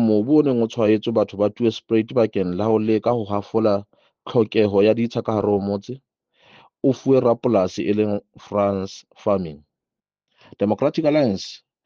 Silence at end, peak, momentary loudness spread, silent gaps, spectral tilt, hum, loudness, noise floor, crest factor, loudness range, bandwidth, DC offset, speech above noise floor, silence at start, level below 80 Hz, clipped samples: 0.3 s; -4 dBFS; 10 LU; none; -7.5 dB/octave; none; -20 LUFS; -88 dBFS; 16 dB; 4 LU; 7.2 kHz; under 0.1%; 68 dB; 0 s; -62 dBFS; under 0.1%